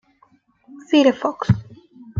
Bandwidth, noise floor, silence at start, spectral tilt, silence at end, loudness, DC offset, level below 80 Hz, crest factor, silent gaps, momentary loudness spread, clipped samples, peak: 7.4 kHz; -58 dBFS; 0.75 s; -7 dB/octave; 0 s; -19 LUFS; under 0.1%; -48 dBFS; 18 dB; none; 7 LU; under 0.1%; -2 dBFS